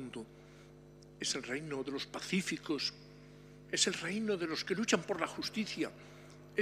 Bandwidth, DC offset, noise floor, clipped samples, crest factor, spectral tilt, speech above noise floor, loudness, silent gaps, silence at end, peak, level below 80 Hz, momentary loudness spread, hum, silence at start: 15.5 kHz; under 0.1%; -56 dBFS; under 0.1%; 24 dB; -3 dB/octave; 20 dB; -36 LUFS; none; 0 s; -14 dBFS; -68 dBFS; 24 LU; 50 Hz at -60 dBFS; 0 s